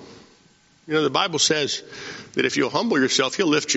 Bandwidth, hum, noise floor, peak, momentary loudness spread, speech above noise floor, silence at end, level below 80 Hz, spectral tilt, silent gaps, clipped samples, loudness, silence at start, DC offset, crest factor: 8 kHz; none; -57 dBFS; -4 dBFS; 10 LU; 35 dB; 0 s; -66 dBFS; -2 dB/octave; none; under 0.1%; -21 LUFS; 0 s; under 0.1%; 20 dB